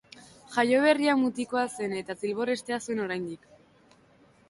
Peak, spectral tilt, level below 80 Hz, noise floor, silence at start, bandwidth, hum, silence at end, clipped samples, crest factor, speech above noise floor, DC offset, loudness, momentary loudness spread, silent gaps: -10 dBFS; -4.5 dB/octave; -70 dBFS; -60 dBFS; 0.15 s; 11.5 kHz; none; 1.15 s; under 0.1%; 20 dB; 33 dB; under 0.1%; -27 LUFS; 11 LU; none